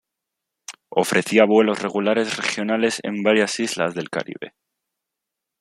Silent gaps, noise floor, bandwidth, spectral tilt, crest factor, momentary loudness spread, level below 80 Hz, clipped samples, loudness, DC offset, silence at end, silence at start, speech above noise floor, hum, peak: none; -83 dBFS; 15.5 kHz; -4 dB/octave; 20 dB; 20 LU; -68 dBFS; under 0.1%; -20 LUFS; under 0.1%; 1.15 s; 0.7 s; 63 dB; none; -2 dBFS